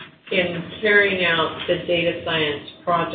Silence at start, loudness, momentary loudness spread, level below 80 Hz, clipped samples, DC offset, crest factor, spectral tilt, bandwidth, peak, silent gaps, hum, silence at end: 0 s; -20 LUFS; 8 LU; -52 dBFS; under 0.1%; under 0.1%; 18 dB; -9.5 dB/octave; 4.7 kHz; -4 dBFS; none; none; 0 s